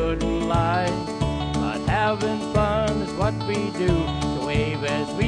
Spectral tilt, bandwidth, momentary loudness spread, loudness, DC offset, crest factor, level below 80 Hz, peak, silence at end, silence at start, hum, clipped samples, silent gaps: -6 dB/octave; 10 kHz; 4 LU; -24 LUFS; under 0.1%; 18 dB; -34 dBFS; -6 dBFS; 0 s; 0 s; none; under 0.1%; none